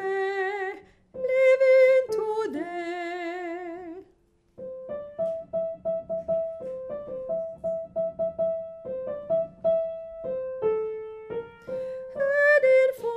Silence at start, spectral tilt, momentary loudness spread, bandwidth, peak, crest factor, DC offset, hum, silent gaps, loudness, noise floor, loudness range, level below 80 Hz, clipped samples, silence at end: 0 s; -5.5 dB/octave; 17 LU; 10 kHz; -10 dBFS; 16 dB; under 0.1%; none; none; -26 LUFS; -63 dBFS; 10 LU; -64 dBFS; under 0.1%; 0 s